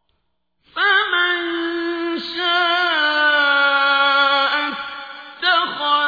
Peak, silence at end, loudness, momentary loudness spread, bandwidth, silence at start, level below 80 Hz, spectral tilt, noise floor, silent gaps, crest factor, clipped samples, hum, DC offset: -4 dBFS; 0 s; -17 LUFS; 10 LU; 5 kHz; 0.75 s; -64 dBFS; -2.5 dB/octave; -72 dBFS; none; 16 dB; under 0.1%; none; under 0.1%